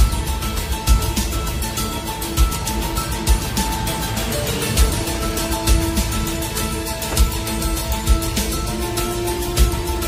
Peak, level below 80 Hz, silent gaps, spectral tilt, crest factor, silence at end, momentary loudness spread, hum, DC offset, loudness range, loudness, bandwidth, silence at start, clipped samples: -4 dBFS; -22 dBFS; none; -4 dB/octave; 16 dB; 0 s; 4 LU; none; under 0.1%; 1 LU; -21 LUFS; 16 kHz; 0 s; under 0.1%